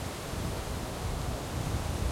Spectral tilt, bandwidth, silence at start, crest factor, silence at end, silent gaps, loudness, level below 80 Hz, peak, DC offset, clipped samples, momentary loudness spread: -5 dB/octave; 16.5 kHz; 0 s; 16 dB; 0 s; none; -35 LUFS; -40 dBFS; -18 dBFS; under 0.1%; under 0.1%; 3 LU